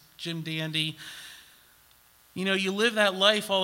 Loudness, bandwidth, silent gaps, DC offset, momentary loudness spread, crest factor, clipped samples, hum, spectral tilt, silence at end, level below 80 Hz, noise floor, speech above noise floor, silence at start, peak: -26 LUFS; 16.5 kHz; none; under 0.1%; 20 LU; 22 dB; under 0.1%; none; -3.5 dB/octave; 0 s; -72 dBFS; -59 dBFS; 32 dB; 0.2 s; -6 dBFS